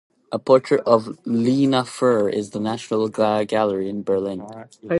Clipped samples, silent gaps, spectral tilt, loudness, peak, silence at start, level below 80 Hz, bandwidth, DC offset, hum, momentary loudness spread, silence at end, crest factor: under 0.1%; none; -6.5 dB/octave; -20 LUFS; -2 dBFS; 0.3 s; -62 dBFS; 11.5 kHz; under 0.1%; none; 11 LU; 0 s; 18 dB